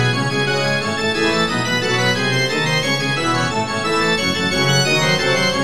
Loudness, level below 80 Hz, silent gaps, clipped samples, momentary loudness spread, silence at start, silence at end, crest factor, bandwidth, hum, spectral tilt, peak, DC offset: -17 LUFS; -48 dBFS; none; under 0.1%; 4 LU; 0 s; 0 s; 14 dB; 16 kHz; none; -4 dB/octave; -4 dBFS; 1%